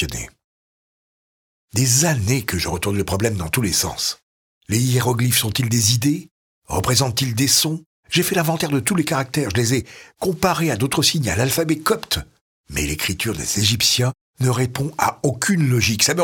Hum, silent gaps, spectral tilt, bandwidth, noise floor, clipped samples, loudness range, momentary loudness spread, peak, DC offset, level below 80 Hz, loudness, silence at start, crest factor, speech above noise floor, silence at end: none; 0.44-1.68 s, 4.23-4.61 s, 6.31-6.62 s, 7.86-8.03 s, 12.41-12.64 s, 14.21-14.34 s; -3.5 dB/octave; 19.5 kHz; under -90 dBFS; under 0.1%; 2 LU; 8 LU; 0 dBFS; under 0.1%; -42 dBFS; -19 LUFS; 0 s; 20 dB; over 71 dB; 0 s